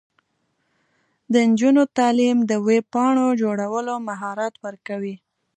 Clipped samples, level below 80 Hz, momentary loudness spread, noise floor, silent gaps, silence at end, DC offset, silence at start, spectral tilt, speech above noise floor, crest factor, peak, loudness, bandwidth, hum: under 0.1%; -74 dBFS; 13 LU; -71 dBFS; none; 0.4 s; under 0.1%; 1.3 s; -5.5 dB/octave; 51 dB; 16 dB; -6 dBFS; -20 LUFS; 10 kHz; none